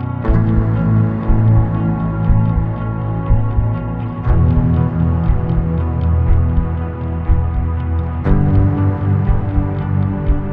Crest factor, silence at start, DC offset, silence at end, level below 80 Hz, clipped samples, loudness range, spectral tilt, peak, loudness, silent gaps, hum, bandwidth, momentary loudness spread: 14 dB; 0 s; 0.6%; 0 s; -20 dBFS; under 0.1%; 1 LU; -12 dB/octave; 0 dBFS; -17 LUFS; none; none; 3.8 kHz; 6 LU